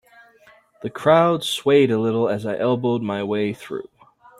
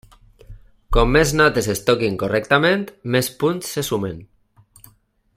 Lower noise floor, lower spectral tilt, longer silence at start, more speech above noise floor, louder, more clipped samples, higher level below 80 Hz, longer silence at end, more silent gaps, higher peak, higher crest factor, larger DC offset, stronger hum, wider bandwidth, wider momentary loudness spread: about the same, -53 dBFS vs -56 dBFS; first, -6 dB/octave vs -4.5 dB/octave; first, 0.8 s vs 0.5 s; about the same, 34 dB vs 37 dB; about the same, -20 LUFS vs -19 LUFS; neither; second, -62 dBFS vs -32 dBFS; second, 0.6 s vs 1.1 s; neither; about the same, -2 dBFS vs 0 dBFS; about the same, 18 dB vs 20 dB; neither; neither; second, 13.5 kHz vs 16 kHz; first, 16 LU vs 9 LU